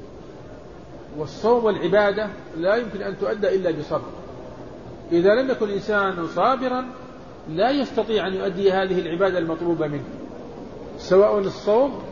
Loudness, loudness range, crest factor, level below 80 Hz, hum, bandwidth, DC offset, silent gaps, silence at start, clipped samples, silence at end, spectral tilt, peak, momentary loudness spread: -22 LUFS; 2 LU; 18 dB; -50 dBFS; none; 7.2 kHz; 0.4%; none; 0 s; under 0.1%; 0 s; -6.5 dB/octave; -6 dBFS; 20 LU